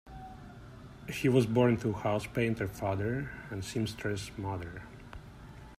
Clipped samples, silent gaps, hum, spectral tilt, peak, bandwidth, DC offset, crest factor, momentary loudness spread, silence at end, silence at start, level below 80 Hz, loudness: under 0.1%; none; none; -6.5 dB/octave; -14 dBFS; 15 kHz; under 0.1%; 20 dB; 22 LU; 0.05 s; 0.05 s; -54 dBFS; -32 LUFS